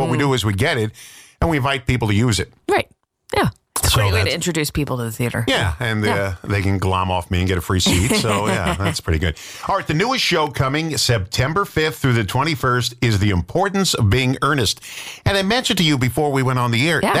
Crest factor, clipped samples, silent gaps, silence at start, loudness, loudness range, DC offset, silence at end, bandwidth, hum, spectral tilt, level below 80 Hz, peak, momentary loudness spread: 14 dB; under 0.1%; none; 0 s; -19 LUFS; 2 LU; under 0.1%; 0 s; 16 kHz; none; -4.5 dB/octave; -38 dBFS; -6 dBFS; 6 LU